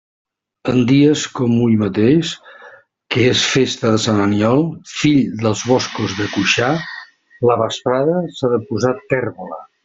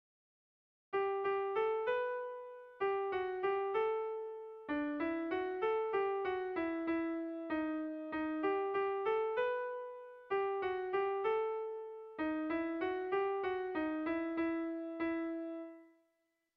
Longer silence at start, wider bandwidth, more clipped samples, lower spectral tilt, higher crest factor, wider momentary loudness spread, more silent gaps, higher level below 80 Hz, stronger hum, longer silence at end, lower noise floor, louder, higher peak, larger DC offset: second, 0.65 s vs 0.9 s; first, 7.8 kHz vs 5.4 kHz; neither; first, -5 dB/octave vs -2.5 dB/octave; about the same, 14 dB vs 14 dB; about the same, 9 LU vs 8 LU; neither; first, -52 dBFS vs -72 dBFS; neither; second, 0.2 s vs 0.7 s; second, -43 dBFS vs -82 dBFS; first, -16 LUFS vs -37 LUFS; first, -2 dBFS vs -24 dBFS; neither